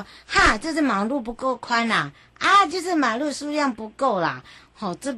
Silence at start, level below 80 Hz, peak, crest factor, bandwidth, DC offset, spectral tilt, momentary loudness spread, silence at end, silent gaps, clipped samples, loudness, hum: 0 s; -42 dBFS; -6 dBFS; 18 dB; 12.5 kHz; under 0.1%; -3.5 dB/octave; 11 LU; 0 s; none; under 0.1%; -22 LUFS; none